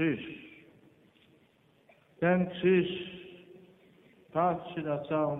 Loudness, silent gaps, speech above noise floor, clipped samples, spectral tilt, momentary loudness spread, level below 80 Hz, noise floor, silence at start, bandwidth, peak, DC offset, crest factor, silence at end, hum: -30 LUFS; none; 37 dB; under 0.1%; -9.5 dB/octave; 22 LU; -68 dBFS; -66 dBFS; 0 s; 4 kHz; -14 dBFS; under 0.1%; 18 dB; 0 s; none